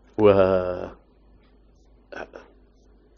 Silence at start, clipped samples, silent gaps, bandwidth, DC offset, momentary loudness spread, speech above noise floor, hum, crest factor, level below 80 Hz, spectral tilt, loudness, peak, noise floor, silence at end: 0.2 s; under 0.1%; none; 6.2 kHz; under 0.1%; 24 LU; 35 dB; none; 22 dB; -52 dBFS; -6 dB/octave; -20 LUFS; -4 dBFS; -56 dBFS; 0.8 s